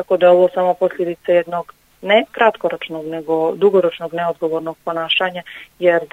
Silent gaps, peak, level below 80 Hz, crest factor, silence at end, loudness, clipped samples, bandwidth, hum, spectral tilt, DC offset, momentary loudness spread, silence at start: none; 0 dBFS; -62 dBFS; 16 dB; 0.05 s; -17 LUFS; under 0.1%; 7.8 kHz; none; -6 dB/octave; under 0.1%; 13 LU; 0 s